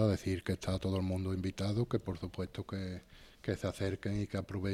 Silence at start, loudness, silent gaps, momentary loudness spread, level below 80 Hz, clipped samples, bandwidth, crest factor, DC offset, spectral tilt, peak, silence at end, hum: 0 s; -37 LUFS; none; 7 LU; -56 dBFS; under 0.1%; 14.5 kHz; 18 dB; under 0.1%; -7 dB/octave; -18 dBFS; 0 s; none